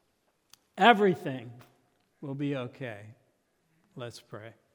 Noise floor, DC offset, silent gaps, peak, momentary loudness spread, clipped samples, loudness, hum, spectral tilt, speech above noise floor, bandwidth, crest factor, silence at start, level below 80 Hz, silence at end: -74 dBFS; under 0.1%; none; -4 dBFS; 25 LU; under 0.1%; -27 LUFS; none; -6 dB/octave; 45 dB; 19 kHz; 28 dB; 0.75 s; -82 dBFS; 0.25 s